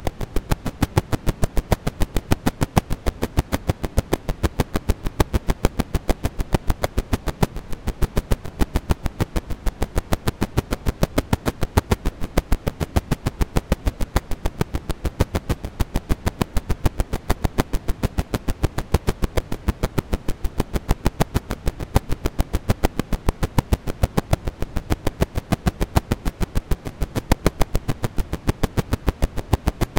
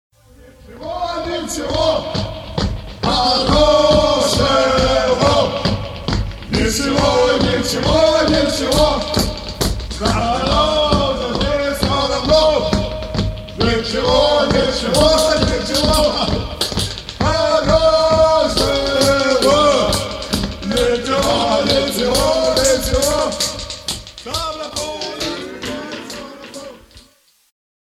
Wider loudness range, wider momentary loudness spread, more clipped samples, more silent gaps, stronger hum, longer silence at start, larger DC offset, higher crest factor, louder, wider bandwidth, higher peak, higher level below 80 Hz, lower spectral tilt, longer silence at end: second, 2 LU vs 6 LU; second, 5 LU vs 11 LU; neither; neither; neither; second, 0 s vs 0.45 s; neither; first, 22 dB vs 16 dB; second, -25 LUFS vs -16 LUFS; about the same, 17 kHz vs 16 kHz; about the same, 0 dBFS vs 0 dBFS; about the same, -26 dBFS vs -28 dBFS; first, -6 dB/octave vs -4 dB/octave; second, 0 s vs 0.95 s